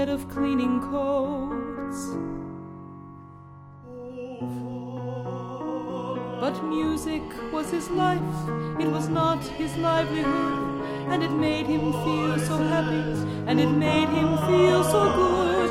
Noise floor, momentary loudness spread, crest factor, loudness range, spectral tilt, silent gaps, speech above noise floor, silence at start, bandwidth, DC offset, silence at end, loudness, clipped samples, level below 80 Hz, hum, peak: -45 dBFS; 13 LU; 16 dB; 13 LU; -6 dB/octave; none; 21 dB; 0 s; 15.5 kHz; under 0.1%; 0 s; -25 LUFS; under 0.1%; -48 dBFS; none; -8 dBFS